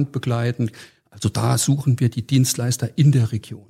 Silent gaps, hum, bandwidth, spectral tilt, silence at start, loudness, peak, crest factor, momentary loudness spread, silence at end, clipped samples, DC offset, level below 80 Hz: none; none; 16 kHz; -5.5 dB/octave; 0 s; -20 LUFS; -4 dBFS; 16 dB; 8 LU; 0.1 s; under 0.1%; under 0.1%; -58 dBFS